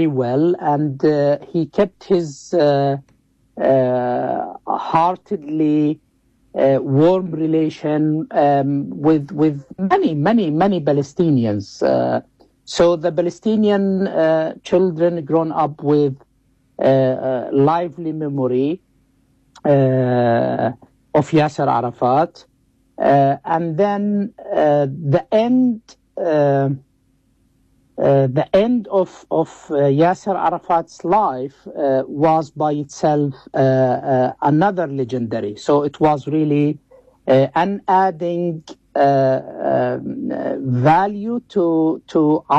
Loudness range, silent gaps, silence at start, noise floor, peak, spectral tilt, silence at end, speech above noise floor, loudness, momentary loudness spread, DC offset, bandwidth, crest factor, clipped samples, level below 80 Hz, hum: 2 LU; none; 0 s; -60 dBFS; -6 dBFS; -8 dB/octave; 0 s; 43 dB; -18 LUFS; 8 LU; under 0.1%; 8.4 kHz; 12 dB; under 0.1%; -56 dBFS; none